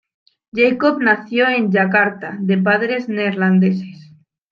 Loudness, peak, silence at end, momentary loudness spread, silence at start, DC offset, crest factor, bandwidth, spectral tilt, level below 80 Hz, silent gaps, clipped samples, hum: -16 LUFS; -2 dBFS; 0.5 s; 7 LU; 0.55 s; under 0.1%; 16 dB; 5.2 kHz; -8.5 dB/octave; -66 dBFS; none; under 0.1%; none